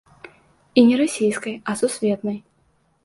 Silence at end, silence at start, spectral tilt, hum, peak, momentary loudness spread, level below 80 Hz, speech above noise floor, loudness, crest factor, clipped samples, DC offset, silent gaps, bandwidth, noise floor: 0.65 s; 0.75 s; -5 dB/octave; none; -2 dBFS; 12 LU; -64 dBFS; 44 dB; -20 LUFS; 20 dB; under 0.1%; under 0.1%; none; 11.5 kHz; -63 dBFS